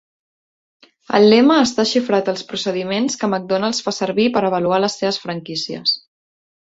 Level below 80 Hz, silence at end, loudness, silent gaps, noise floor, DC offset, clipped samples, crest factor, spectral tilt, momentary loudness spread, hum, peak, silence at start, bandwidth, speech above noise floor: -60 dBFS; 0.7 s; -17 LUFS; none; under -90 dBFS; under 0.1%; under 0.1%; 18 dB; -4.5 dB/octave; 11 LU; none; -2 dBFS; 1.1 s; 8 kHz; over 73 dB